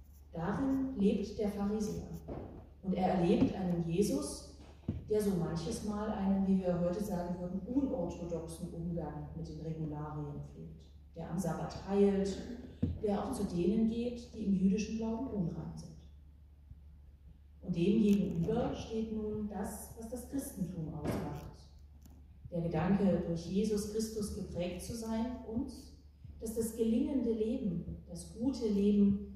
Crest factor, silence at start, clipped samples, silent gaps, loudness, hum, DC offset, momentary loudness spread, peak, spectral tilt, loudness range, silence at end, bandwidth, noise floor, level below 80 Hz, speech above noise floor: 18 dB; 0 s; under 0.1%; none; -35 LUFS; none; under 0.1%; 15 LU; -16 dBFS; -7 dB/octave; 6 LU; 0 s; 15 kHz; -57 dBFS; -54 dBFS; 23 dB